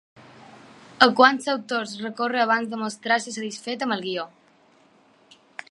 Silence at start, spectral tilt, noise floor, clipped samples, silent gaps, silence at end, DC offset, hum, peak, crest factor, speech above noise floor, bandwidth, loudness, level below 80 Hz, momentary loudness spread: 1 s; -3 dB/octave; -58 dBFS; under 0.1%; none; 1.45 s; under 0.1%; none; 0 dBFS; 24 dB; 35 dB; 11.5 kHz; -22 LUFS; -70 dBFS; 15 LU